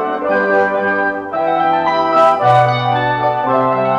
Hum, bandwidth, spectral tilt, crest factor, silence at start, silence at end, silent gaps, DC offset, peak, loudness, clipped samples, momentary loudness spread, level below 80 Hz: none; 8.8 kHz; -7 dB/octave; 12 dB; 0 s; 0 s; none; under 0.1%; 0 dBFS; -14 LUFS; under 0.1%; 5 LU; -52 dBFS